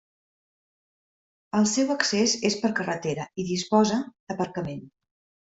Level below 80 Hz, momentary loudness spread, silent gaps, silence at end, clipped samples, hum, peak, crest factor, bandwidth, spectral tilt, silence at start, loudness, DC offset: -64 dBFS; 10 LU; 4.20-4.27 s; 0.55 s; under 0.1%; none; -6 dBFS; 22 dB; 8.2 kHz; -4 dB/octave; 1.55 s; -25 LUFS; under 0.1%